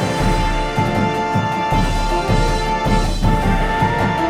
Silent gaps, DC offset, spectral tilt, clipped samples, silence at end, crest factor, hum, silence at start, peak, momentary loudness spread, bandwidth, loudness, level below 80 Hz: none; under 0.1%; -5.5 dB/octave; under 0.1%; 0 s; 14 dB; none; 0 s; -2 dBFS; 2 LU; 14.5 kHz; -18 LUFS; -22 dBFS